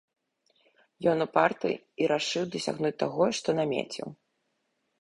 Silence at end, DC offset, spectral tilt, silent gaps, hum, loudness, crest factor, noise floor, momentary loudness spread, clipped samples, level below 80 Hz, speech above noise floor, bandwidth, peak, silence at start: 0.9 s; under 0.1%; -4.5 dB/octave; none; none; -28 LUFS; 22 dB; -77 dBFS; 7 LU; under 0.1%; -70 dBFS; 49 dB; 11.5 kHz; -8 dBFS; 1 s